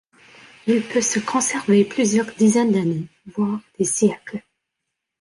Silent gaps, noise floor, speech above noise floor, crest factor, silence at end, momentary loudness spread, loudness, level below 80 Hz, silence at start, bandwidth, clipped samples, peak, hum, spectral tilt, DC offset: none; -80 dBFS; 61 dB; 16 dB; 0.8 s; 12 LU; -20 LUFS; -64 dBFS; 0.65 s; 11.5 kHz; under 0.1%; -6 dBFS; none; -4.5 dB/octave; under 0.1%